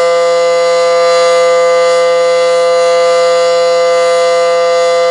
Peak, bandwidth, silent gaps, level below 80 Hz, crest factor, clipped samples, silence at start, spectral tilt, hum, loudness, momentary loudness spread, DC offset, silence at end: 0 dBFS; 11.5 kHz; none; -60 dBFS; 8 dB; under 0.1%; 0 s; -1 dB/octave; none; -9 LUFS; 1 LU; under 0.1%; 0 s